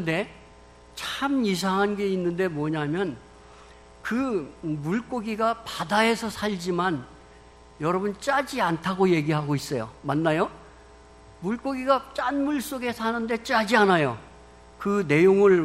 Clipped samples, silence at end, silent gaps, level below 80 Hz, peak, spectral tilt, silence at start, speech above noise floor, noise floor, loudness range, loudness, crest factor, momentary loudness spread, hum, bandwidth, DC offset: under 0.1%; 0 s; none; -54 dBFS; -6 dBFS; -5.5 dB/octave; 0 s; 26 dB; -50 dBFS; 4 LU; -25 LUFS; 18 dB; 11 LU; none; 13 kHz; under 0.1%